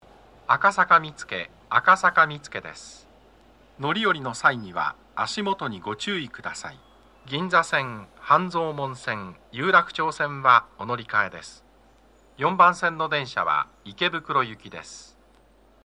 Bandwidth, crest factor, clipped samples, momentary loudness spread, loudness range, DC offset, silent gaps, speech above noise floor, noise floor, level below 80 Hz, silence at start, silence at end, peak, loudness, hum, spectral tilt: 11 kHz; 22 dB; under 0.1%; 18 LU; 5 LU; under 0.1%; none; 33 dB; -57 dBFS; -60 dBFS; 0.5 s; 0.8 s; -2 dBFS; -23 LUFS; none; -4 dB/octave